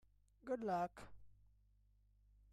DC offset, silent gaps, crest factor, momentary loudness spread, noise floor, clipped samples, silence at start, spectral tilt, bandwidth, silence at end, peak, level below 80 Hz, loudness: under 0.1%; none; 18 dB; 20 LU; -73 dBFS; under 0.1%; 0.45 s; -7 dB/octave; 13.5 kHz; 1.2 s; -30 dBFS; -70 dBFS; -44 LUFS